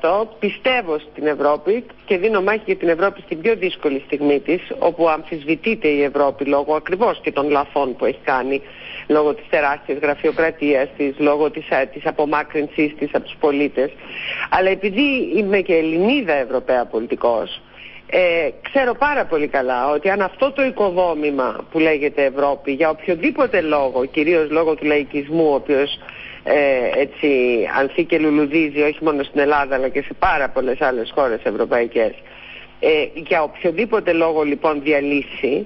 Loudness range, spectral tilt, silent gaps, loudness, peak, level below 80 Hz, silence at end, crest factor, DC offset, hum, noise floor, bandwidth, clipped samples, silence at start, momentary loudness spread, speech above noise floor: 2 LU; -10 dB/octave; none; -18 LUFS; -6 dBFS; -50 dBFS; 0 s; 12 dB; under 0.1%; none; -39 dBFS; 5.8 kHz; under 0.1%; 0 s; 6 LU; 20 dB